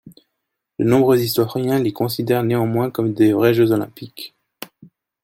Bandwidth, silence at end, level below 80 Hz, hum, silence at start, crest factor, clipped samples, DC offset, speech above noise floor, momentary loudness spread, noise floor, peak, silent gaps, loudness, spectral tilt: 16.5 kHz; 0.6 s; -58 dBFS; none; 0.05 s; 16 dB; under 0.1%; under 0.1%; 60 dB; 22 LU; -78 dBFS; -2 dBFS; none; -18 LUFS; -6.5 dB/octave